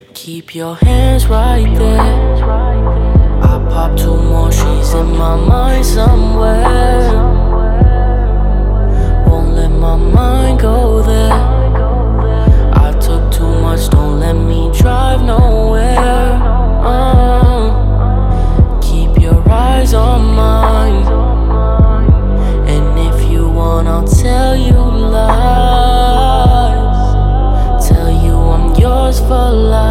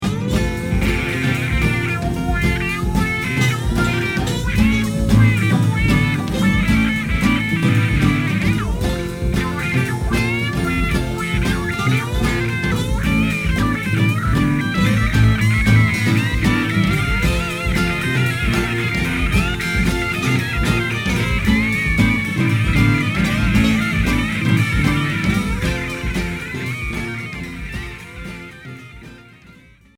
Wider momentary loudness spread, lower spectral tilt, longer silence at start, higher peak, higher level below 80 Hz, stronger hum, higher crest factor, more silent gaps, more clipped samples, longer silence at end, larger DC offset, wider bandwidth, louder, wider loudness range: second, 3 LU vs 7 LU; about the same, -7 dB/octave vs -6 dB/octave; first, 0.15 s vs 0 s; about the same, 0 dBFS vs -2 dBFS; first, -10 dBFS vs -26 dBFS; neither; second, 8 dB vs 16 dB; neither; first, 0.5% vs under 0.1%; second, 0 s vs 0.75 s; neither; second, 14.5 kHz vs 17 kHz; first, -11 LUFS vs -18 LUFS; second, 1 LU vs 4 LU